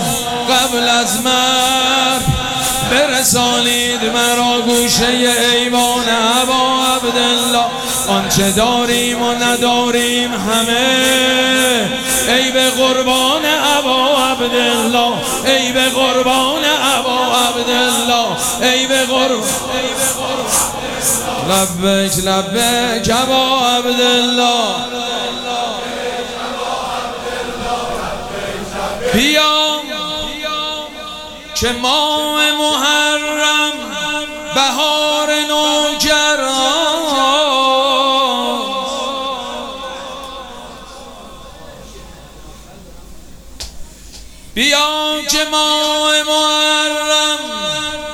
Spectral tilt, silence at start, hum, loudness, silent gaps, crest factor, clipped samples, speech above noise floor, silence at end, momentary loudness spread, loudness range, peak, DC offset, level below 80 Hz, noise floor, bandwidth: -2 dB/octave; 0 s; none; -13 LUFS; none; 14 dB; under 0.1%; 22 dB; 0 s; 10 LU; 7 LU; 0 dBFS; under 0.1%; -40 dBFS; -35 dBFS; 17.5 kHz